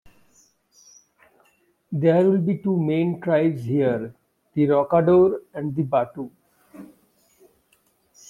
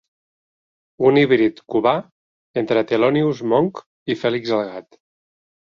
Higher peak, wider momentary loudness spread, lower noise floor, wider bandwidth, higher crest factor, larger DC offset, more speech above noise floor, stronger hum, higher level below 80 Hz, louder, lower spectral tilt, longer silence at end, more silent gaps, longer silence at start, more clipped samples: second, -6 dBFS vs -2 dBFS; about the same, 14 LU vs 12 LU; second, -64 dBFS vs under -90 dBFS; about the same, 7.2 kHz vs 7 kHz; about the same, 18 dB vs 18 dB; neither; second, 44 dB vs over 72 dB; neither; about the same, -62 dBFS vs -62 dBFS; about the same, -21 LUFS vs -19 LUFS; first, -9 dB/octave vs -7.5 dB/octave; first, 1.45 s vs 0.95 s; second, none vs 2.11-2.54 s, 3.86-4.06 s; first, 1.9 s vs 1 s; neither